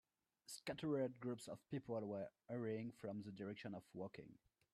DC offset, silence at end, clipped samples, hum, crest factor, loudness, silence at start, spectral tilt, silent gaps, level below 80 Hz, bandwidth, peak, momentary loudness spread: under 0.1%; 0.4 s; under 0.1%; none; 18 dB; -49 LUFS; 0.5 s; -6 dB/octave; none; -84 dBFS; 13.5 kHz; -32 dBFS; 10 LU